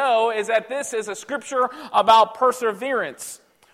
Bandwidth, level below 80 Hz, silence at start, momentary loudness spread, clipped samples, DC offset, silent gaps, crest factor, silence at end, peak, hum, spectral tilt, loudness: 16 kHz; -68 dBFS; 0 s; 14 LU; under 0.1%; under 0.1%; none; 18 dB; 0.4 s; -4 dBFS; none; -2 dB/octave; -21 LUFS